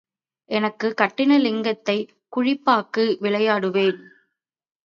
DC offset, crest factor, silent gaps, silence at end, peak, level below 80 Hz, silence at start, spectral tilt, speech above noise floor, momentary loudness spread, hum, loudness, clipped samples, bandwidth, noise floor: under 0.1%; 20 dB; none; 0.85 s; -2 dBFS; -74 dBFS; 0.5 s; -6 dB/octave; 54 dB; 8 LU; none; -21 LUFS; under 0.1%; 7.2 kHz; -75 dBFS